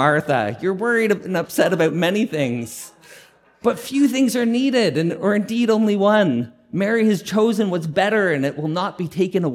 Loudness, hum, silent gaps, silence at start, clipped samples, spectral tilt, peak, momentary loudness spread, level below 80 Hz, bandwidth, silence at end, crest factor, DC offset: -19 LUFS; none; none; 0 s; under 0.1%; -5.5 dB/octave; -2 dBFS; 7 LU; -64 dBFS; 16 kHz; 0 s; 16 dB; under 0.1%